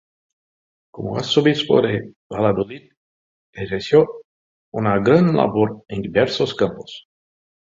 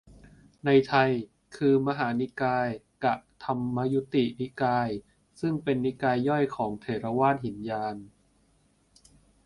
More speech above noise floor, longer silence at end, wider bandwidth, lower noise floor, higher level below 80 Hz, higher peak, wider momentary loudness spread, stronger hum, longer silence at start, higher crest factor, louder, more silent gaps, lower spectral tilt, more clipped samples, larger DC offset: first, over 72 dB vs 40 dB; second, 0.7 s vs 1.4 s; second, 7.6 kHz vs 11 kHz; first, under -90 dBFS vs -66 dBFS; first, -52 dBFS vs -62 dBFS; first, -2 dBFS vs -8 dBFS; first, 16 LU vs 9 LU; neither; first, 0.95 s vs 0.1 s; about the same, 18 dB vs 20 dB; first, -19 LUFS vs -28 LUFS; first, 2.16-2.30 s, 2.97-3.53 s, 4.25-4.72 s vs none; about the same, -6.5 dB/octave vs -7.5 dB/octave; neither; neither